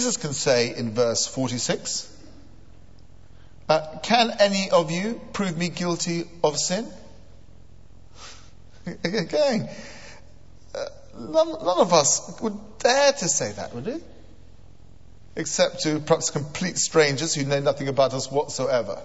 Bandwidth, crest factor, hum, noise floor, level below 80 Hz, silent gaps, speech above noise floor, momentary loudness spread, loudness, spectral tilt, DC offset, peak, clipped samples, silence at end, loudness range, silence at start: 8.2 kHz; 22 dB; none; -50 dBFS; -54 dBFS; none; 27 dB; 18 LU; -23 LUFS; -3.5 dB/octave; 0.7%; -2 dBFS; under 0.1%; 0 s; 7 LU; 0 s